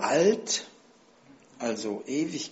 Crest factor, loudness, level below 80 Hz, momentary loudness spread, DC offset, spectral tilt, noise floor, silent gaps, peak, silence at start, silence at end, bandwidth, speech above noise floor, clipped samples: 18 dB; -28 LUFS; -74 dBFS; 11 LU; under 0.1%; -3.5 dB/octave; -58 dBFS; none; -12 dBFS; 0 s; 0 s; 8 kHz; 31 dB; under 0.1%